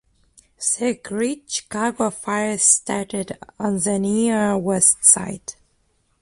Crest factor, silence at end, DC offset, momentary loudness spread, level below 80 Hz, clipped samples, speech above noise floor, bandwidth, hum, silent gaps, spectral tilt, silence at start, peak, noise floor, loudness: 22 dB; 0.7 s; under 0.1%; 14 LU; -58 dBFS; under 0.1%; 44 dB; 11.5 kHz; none; none; -3 dB/octave; 0.6 s; 0 dBFS; -65 dBFS; -19 LUFS